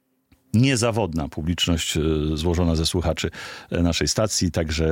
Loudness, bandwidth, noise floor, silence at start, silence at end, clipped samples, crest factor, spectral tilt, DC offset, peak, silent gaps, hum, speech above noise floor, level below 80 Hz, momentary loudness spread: -22 LUFS; 16.5 kHz; -61 dBFS; 0.55 s; 0 s; under 0.1%; 16 dB; -4.5 dB/octave; under 0.1%; -6 dBFS; none; none; 40 dB; -38 dBFS; 7 LU